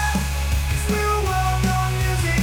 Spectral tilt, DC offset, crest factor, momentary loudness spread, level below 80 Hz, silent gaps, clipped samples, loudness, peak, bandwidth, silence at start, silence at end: -5 dB/octave; under 0.1%; 12 dB; 3 LU; -24 dBFS; none; under 0.1%; -21 LUFS; -10 dBFS; 19 kHz; 0 s; 0 s